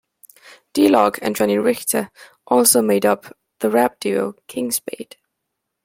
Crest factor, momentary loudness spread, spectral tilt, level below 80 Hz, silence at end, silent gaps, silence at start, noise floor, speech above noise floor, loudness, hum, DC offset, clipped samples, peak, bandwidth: 20 dB; 13 LU; -3.5 dB/octave; -62 dBFS; 0.8 s; none; 0.75 s; -78 dBFS; 60 dB; -18 LUFS; none; under 0.1%; under 0.1%; 0 dBFS; 16.5 kHz